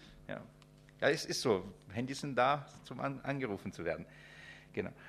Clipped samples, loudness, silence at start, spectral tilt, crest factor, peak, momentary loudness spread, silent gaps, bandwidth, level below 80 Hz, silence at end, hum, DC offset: under 0.1%; -37 LUFS; 0 s; -4.5 dB/octave; 22 dB; -16 dBFS; 18 LU; none; 14.5 kHz; -66 dBFS; 0 s; none; under 0.1%